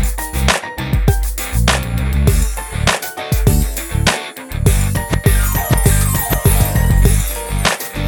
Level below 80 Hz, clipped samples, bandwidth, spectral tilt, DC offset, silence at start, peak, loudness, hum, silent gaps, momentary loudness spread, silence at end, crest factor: -18 dBFS; under 0.1%; 19.5 kHz; -4.5 dB/octave; under 0.1%; 0 s; 0 dBFS; -16 LUFS; none; none; 6 LU; 0 s; 14 dB